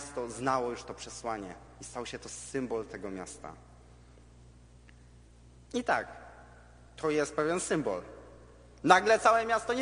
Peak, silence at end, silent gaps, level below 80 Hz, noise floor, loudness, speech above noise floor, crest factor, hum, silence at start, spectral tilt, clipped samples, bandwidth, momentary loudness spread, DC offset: -6 dBFS; 0 s; none; -58 dBFS; -56 dBFS; -31 LUFS; 25 dB; 26 dB; none; 0 s; -4 dB/octave; under 0.1%; 10 kHz; 22 LU; under 0.1%